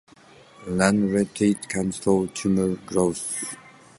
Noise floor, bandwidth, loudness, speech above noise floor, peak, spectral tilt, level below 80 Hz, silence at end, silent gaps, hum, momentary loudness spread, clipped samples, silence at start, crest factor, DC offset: -51 dBFS; 11.5 kHz; -24 LUFS; 28 dB; -2 dBFS; -5.5 dB/octave; -52 dBFS; 0.3 s; none; none; 9 LU; under 0.1%; 0.6 s; 22 dB; under 0.1%